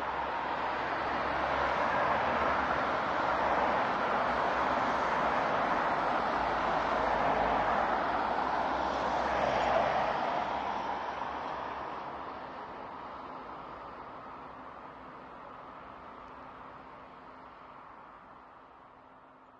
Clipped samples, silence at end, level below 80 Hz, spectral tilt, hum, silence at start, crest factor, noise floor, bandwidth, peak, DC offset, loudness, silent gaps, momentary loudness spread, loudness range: under 0.1%; 0.05 s; -56 dBFS; -5 dB/octave; none; 0 s; 18 dB; -56 dBFS; 9.2 kHz; -16 dBFS; under 0.1%; -31 LUFS; none; 19 LU; 18 LU